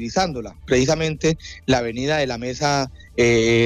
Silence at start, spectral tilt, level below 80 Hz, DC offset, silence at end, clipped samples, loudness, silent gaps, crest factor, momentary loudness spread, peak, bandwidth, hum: 0 s; -5 dB/octave; -40 dBFS; under 0.1%; 0 s; under 0.1%; -21 LUFS; none; 14 dB; 7 LU; -6 dBFS; 12.5 kHz; none